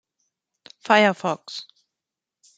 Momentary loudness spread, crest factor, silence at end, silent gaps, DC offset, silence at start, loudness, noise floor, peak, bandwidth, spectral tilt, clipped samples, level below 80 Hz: 19 LU; 22 dB; 0.95 s; none; under 0.1%; 0.9 s; -20 LUFS; -87 dBFS; -2 dBFS; 9.2 kHz; -4.5 dB/octave; under 0.1%; -76 dBFS